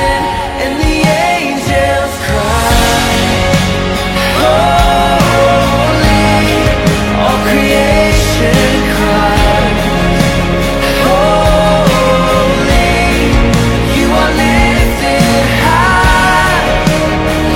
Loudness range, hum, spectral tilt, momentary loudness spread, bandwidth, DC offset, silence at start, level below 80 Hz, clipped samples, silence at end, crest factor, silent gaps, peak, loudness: 2 LU; none; -5 dB/octave; 4 LU; 17 kHz; under 0.1%; 0 s; -18 dBFS; under 0.1%; 0 s; 10 dB; none; 0 dBFS; -10 LUFS